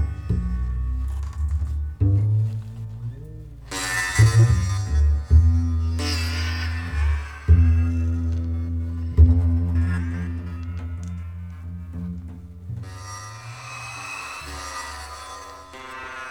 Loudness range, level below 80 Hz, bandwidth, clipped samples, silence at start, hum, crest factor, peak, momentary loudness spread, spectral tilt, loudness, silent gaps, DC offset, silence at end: 13 LU; -26 dBFS; 12 kHz; under 0.1%; 0 s; none; 18 dB; -4 dBFS; 18 LU; -5.5 dB/octave; -23 LUFS; none; 0.1%; 0 s